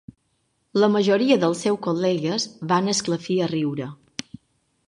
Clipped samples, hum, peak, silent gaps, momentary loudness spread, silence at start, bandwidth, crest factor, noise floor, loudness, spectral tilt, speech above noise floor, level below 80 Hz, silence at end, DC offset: under 0.1%; none; -4 dBFS; none; 14 LU; 0.75 s; 11.5 kHz; 18 dB; -70 dBFS; -22 LUFS; -5 dB/octave; 49 dB; -66 dBFS; 0.95 s; under 0.1%